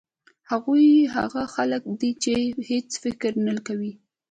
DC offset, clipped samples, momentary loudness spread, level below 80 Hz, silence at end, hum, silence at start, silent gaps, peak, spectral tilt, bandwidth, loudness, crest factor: under 0.1%; under 0.1%; 13 LU; -60 dBFS; 0.4 s; none; 0.5 s; none; -8 dBFS; -4.5 dB/octave; 9.4 kHz; -23 LUFS; 16 dB